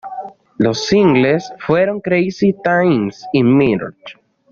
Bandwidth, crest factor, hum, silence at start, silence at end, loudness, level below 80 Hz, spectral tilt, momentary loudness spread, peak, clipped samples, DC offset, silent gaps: 7.4 kHz; 14 dB; none; 0.05 s; 0.4 s; -15 LUFS; -50 dBFS; -6.5 dB/octave; 11 LU; -2 dBFS; under 0.1%; under 0.1%; none